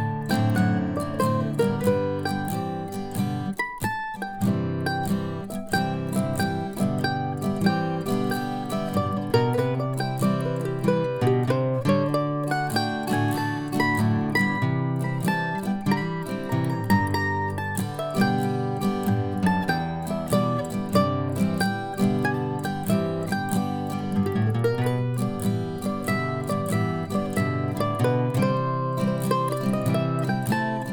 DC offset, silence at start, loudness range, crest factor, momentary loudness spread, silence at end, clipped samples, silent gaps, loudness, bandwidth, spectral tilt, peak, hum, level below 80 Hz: under 0.1%; 0 s; 2 LU; 18 dB; 5 LU; 0 s; under 0.1%; none; -25 LUFS; 19.5 kHz; -6.5 dB/octave; -6 dBFS; none; -54 dBFS